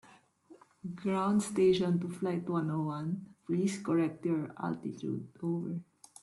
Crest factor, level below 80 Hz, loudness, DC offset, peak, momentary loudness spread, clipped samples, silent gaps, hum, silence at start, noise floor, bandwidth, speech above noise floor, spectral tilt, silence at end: 16 dB; -72 dBFS; -33 LUFS; under 0.1%; -18 dBFS; 11 LU; under 0.1%; none; none; 0.5 s; -60 dBFS; 12 kHz; 28 dB; -7 dB/octave; 0.4 s